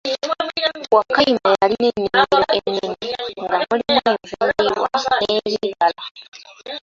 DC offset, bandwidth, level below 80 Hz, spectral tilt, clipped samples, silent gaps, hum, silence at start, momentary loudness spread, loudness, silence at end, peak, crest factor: under 0.1%; 7.6 kHz; -54 dBFS; -4 dB/octave; under 0.1%; 6.11-6.15 s, 6.28-6.32 s; none; 0.05 s; 10 LU; -18 LUFS; 0.05 s; -2 dBFS; 18 dB